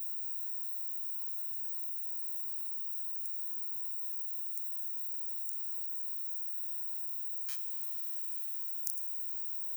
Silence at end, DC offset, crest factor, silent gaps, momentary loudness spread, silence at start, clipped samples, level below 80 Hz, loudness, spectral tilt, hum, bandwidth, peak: 0 s; under 0.1%; 22 dB; none; 0 LU; 0 s; under 0.1%; -80 dBFS; -30 LUFS; 2 dB/octave; none; over 20 kHz; -12 dBFS